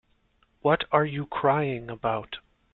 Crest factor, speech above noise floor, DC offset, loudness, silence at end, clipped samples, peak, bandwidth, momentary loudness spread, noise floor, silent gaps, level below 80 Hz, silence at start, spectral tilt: 20 dB; 41 dB; under 0.1%; -26 LUFS; 0.35 s; under 0.1%; -6 dBFS; 4.4 kHz; 10 LU; -67 dBFS; none; -58 dBFS; 0.65 s; -10 dB/octave